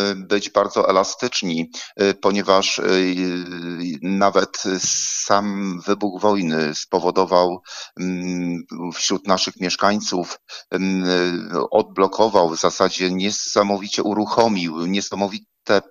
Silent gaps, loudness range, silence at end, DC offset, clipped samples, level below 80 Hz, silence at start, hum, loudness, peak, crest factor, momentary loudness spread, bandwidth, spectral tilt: none; 2 LU; 0.1 s; under 0.1%; under 0.1%; -64 dBFS; 0 s; none; -20 LUFS; 0 dBFS; 20 dB; 9 LU; 14 kHz; -3.5 dB/octave